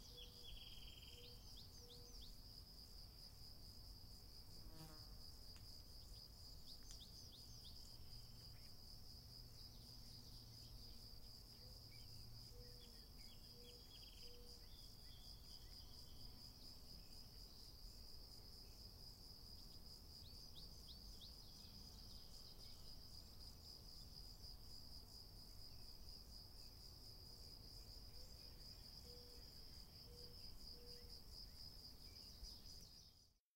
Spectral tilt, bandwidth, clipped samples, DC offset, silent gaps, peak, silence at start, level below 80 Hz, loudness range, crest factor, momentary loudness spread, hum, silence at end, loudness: -3.5 dB/octave; 16 kHz; under 0.1%; under 0.1%; none; -40 dBFS; 0 s; -64 dBFS; 1 LU; 18 dB; 2 LU; none; 0.15 s; -59 LUFS